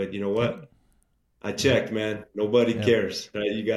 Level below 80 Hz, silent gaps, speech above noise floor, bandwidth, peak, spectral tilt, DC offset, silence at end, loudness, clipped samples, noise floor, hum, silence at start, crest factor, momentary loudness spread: -60 dBFS; none; 42 dB; 13 kHz; -8 dBFS; -5 dB/octave; under 0.1%; 0 s; -25 LUFS; under 0.1%; -67 dBFS; none; 0 s; 18 dB; 9 LU